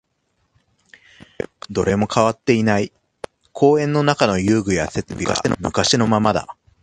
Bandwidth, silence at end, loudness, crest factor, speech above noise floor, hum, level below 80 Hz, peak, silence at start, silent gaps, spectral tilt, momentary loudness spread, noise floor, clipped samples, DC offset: 10.5 kHz; 0.3 s; -18 LUFS; 20 dB; 51 dB; none; -44 dBFS; 0 dBFS; 1.7 s; none; -5 dB/octave; 16 LU; -68 dBFS; under 0.1%; under 0.1%